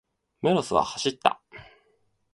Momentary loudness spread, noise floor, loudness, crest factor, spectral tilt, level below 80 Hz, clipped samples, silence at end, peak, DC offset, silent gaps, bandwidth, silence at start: 6 LU; -68 dBFS; -25 LUFS; 26 dB; -4.5 dB/octave; -60 dBFS; under 0.1%; 0.7 s; -2 dBFS; under 0.1%; none; 11.5 kHz; 0.45 s